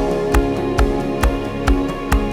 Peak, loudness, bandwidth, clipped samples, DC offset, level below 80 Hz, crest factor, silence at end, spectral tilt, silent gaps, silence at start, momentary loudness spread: 0 dBFS; -19 LUFS; 16 kHz; under 0.1%; under 0.1%; -20 dBFS; 18 dB; 0 s; -6.5 dB/octave; none; 0 s; 2 LU